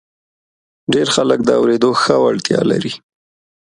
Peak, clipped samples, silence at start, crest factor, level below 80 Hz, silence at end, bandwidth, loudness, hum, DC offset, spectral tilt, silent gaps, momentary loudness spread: 0 dBFS; under 0.1%; 0.9 s; 16 dB; -54 dBFS; 0.7 s; 11.5 kHz; -14 LUFS; none; under 0.1%; -4.5 dB/octave; none; 10 LU